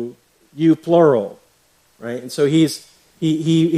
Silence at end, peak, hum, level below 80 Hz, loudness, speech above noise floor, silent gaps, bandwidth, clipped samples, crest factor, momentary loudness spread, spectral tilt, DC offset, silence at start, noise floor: 0 s; -2 dBFS; none; -62 dBFS; -17 LUFS; 42 dB; none; 14 kHz; under 0.1%; 16 dB; 18 LU; -6.5 dB/octave; under 0.1%; 0 s; -58 dBFS